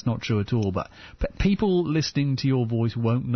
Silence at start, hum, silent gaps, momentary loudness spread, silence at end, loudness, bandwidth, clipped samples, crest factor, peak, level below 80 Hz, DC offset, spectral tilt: 0.05 s; none; none; 10 LU; 0 s; -25 LUFS; 6.4 kHz; under 0.1%; 14 dB; -10 dBFS; -40 dBFS; under 0.1%; -7 dB/octave